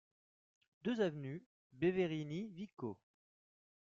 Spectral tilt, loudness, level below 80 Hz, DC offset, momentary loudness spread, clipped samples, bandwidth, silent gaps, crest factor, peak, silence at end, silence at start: -6 dB/octave; -41 LUFS; -78 dBFS; under 0.1%; 12 LU; under 0.1%; 7.4 kHz; 1.46-1.70 s, 2.73-2.77 s; 18 dB; -24 dBFS; 0.95 s; 0.85 s